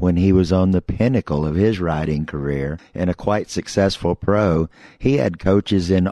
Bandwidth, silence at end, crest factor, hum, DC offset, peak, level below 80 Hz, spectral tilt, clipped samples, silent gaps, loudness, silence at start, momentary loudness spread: 11 kHz; 0 s; 14 dB; none; under 0.1%; -4 dBFS; -36 dBFS; -7 dB/octave; under 0.1%; none; -19 LUFS; 0 s; 8 LU